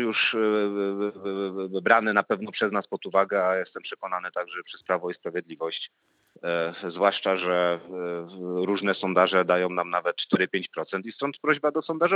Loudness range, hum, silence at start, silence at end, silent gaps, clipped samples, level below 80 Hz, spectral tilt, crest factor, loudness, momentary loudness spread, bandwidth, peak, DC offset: 5 LU; none; 0 s; 0 s; none; under 0.1%; -84 dBFS; -7 dB/octave; 24 dB; -26 LUFS; 11 LU; 7.2 kHz; -2 dBFS; under 0.1%